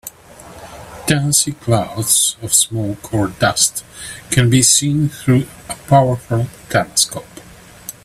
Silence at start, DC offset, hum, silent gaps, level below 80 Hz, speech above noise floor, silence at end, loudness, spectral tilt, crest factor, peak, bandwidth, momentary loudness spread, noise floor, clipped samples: 0.05 s; under 0.1%; none; none; -44 dBFS; 24 dB; 0.15 s; -15 LUFS; -3.5 dB/octave; 18 dB; 0 dBFS; 15.5 kHz; 19 LU; -40 dBFS; under 0.1%